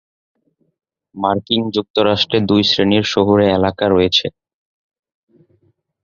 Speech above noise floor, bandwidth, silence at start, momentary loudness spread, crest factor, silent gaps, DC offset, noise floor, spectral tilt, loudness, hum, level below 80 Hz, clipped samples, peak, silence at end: 46 dB; 7.4 kHz; 1.15 s; 6 LU; 16 dB; 1.90-1.94 s; under 0.1%; -60 dBFS; -5.5 dB/octave; -15 LUFS; none; -44 dBFS; under 0.1%; 0 dBFS; 1.75 s